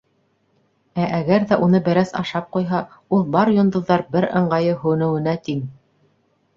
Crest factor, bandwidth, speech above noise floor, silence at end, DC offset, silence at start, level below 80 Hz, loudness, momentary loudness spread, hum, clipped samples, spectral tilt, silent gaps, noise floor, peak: 18 dB; 7.2 kHz; 46 dB; 0.85 s; under 0.1%; 0.95 s; -56 dBFS; -19 LUFS; 8 LU; none; under 0.1%; -8 dB/octave; none; -64 dBFS; -2 dBFS